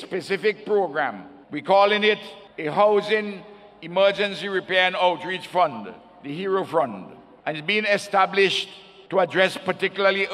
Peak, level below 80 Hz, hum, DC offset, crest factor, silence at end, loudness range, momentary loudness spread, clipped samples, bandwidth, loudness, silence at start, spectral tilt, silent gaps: -4 dBFS; -72 dBFS; none; under 0.1%; 20 dB; 0 s; 2 LU; 16 LU; under 0.1%; 12.5 kHz; -22 LUFS; 0 s; -4.5 dB/octave; none